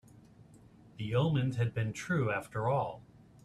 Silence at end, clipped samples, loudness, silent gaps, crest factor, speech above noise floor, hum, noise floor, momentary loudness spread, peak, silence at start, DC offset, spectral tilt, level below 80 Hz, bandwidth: 0.45 s; under 0.1%; -33 LUFS; none; 16 dB; 26 dB; none; -58 dBFS; 9 LU; -18 dBFS; 0.55 s; under 0.1%; -7 dB/octave; -62 dBFS; 12 kHz